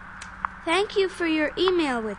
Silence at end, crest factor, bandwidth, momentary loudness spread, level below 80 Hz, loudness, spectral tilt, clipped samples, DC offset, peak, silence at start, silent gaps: 0 s; 18 dB; 10.5 kHz; 11 LU; -50 dBFS; -24 LUFS; -4 dB/octave; under 0.1%; under 0.1%; -6 dBFS; 0 s; none